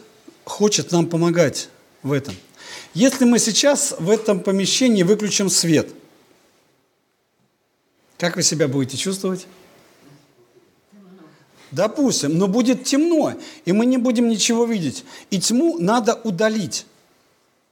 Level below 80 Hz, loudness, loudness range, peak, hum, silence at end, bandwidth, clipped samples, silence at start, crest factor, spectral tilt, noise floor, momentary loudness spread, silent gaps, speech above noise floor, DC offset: -70 dBFS; -18 LUFS; 7 LU; -2 dBFS; none; 0.9 s; 18 kHz; under 0.1%; 0.45 s; 18 dB; -4 dB/octave; -67 dBFS; 13 LU; none; 48 dB; under 0.1%